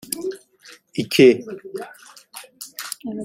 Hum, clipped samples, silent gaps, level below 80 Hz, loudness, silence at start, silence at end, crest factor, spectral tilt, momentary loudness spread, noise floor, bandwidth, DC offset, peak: none; under 0.1%; none; -66 dBFS; -19 LUFS; 0.1 s; 0 s; 20 dB; -4.5 dB/octave; 25 LU; -49 dBFS; 16 kHz; under 0.1%; -2 dBFS